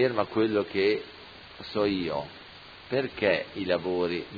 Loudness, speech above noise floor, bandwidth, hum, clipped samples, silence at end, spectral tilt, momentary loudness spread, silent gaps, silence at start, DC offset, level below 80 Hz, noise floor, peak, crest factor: -28 LUFS; 20 dB; 5 kHz; none; under 0.1%; 0 s; -7.5 dB/octave; 19 LU; none; 0 s; under 0.1%; -60 dBFS; -48 dBFS; -10 dBFS; 20 dB